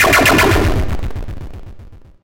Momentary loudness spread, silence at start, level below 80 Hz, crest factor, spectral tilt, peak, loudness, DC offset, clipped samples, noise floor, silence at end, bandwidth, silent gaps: 22 LU; 0 s; -24 dBFS; 14 dB; -4 dB/octave; 0 dBFS; -13 LUFS; under 0.1%; under 0.1%; -37 dBFS; 0.25 s; 17 kHz; none